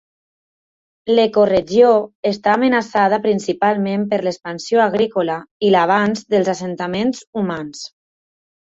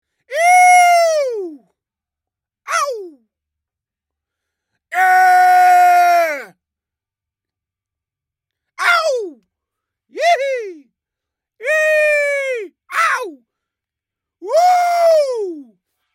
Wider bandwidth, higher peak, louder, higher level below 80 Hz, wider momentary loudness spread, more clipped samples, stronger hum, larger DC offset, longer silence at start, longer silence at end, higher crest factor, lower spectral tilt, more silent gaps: second, 8 kHz vs 16.5 kHz; about the same, -2 dBFS vs -2 dBFS; second, -17 LUFS vs -13 LUFS; first, -56 dBFS vs -84 dBFS; second, 10 LU vs 17 LU; neither; neither; neither; first, 1.05 s vs 0.3 s; first, 0.8 s vs 0.5 s; about the same, 16 dB vs 14 dB; first, -5.5 dB/octave vs 1 dB/octave; first, 2.15-2.23 s, 5.51-5.60 s, 7.27-7.33 s vs none